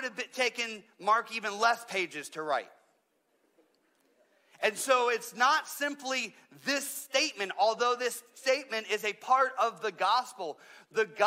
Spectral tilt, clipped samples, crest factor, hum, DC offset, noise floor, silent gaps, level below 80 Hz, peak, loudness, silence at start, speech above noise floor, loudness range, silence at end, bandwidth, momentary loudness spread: -1 dB/octave; under 0.1%; 20 dB; none; under 0.1%; -74 dBFS; none; under -90 dBFS; -12 dBFS; -30 LUFS; 0 s; 43 dB; 5 LU; 0 s; 16 kHz; 10 LU